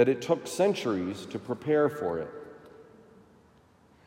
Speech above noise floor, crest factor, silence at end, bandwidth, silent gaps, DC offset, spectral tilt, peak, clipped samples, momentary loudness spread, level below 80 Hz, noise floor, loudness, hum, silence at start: 32 dB; 20 dB; 1.25 s; 16 kHz; none; under 0.1%; -5.5 dB/octave; -10 dBFS; under 0.1%; 18 LU; -70 dBFS; -60 dBFS; -29 LUFS; none; 0 s